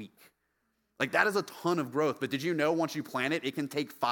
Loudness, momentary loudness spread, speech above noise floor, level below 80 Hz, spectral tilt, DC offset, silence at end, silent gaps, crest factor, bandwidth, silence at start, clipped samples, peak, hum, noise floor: -31 LUFS; 7 LU; 47 dB; -78 dBFS; -5 dB/octave; under 0.1%; 0 s; none; 24 dB; 18 kHz; 0 s; under 0.1%; -8 dBFS; none; -78 dBFS